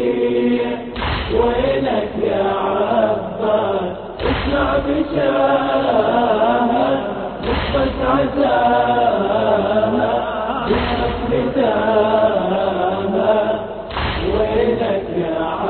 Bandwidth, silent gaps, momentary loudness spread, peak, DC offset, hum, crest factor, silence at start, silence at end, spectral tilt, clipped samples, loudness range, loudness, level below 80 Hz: 4.5 kHz; none; 6 LU; -2 dBFS; under 0.1%; none; 14 dB; 0 s; 0 s; -10 dB/octave; under 0.1%; 2 LU; -18 LUFS; -34 dBFS